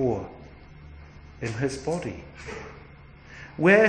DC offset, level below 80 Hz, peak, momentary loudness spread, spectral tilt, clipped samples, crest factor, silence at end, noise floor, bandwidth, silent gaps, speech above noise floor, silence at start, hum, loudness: under 0.1%; -50 dBFS; -4 dBFS; 21 LU; -6 dB/octave; under 0.1%; 22 dB; 0 s; -48 dBFS; 10 kHz; none; 24 dB; 0 s; none; -29 LUFS